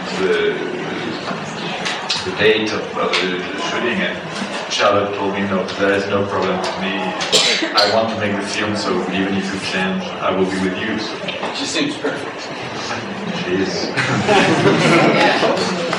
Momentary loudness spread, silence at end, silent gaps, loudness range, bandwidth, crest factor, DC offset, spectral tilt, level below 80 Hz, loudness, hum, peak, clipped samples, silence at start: 10 LU; 0 s; none; 5 LU; 12.5 kHz; 16 dB; under 0.1%; -4 dB/octave; -56 dBFS; -18 LUFS; none; -2 dBFS; under 0.1%; 0 s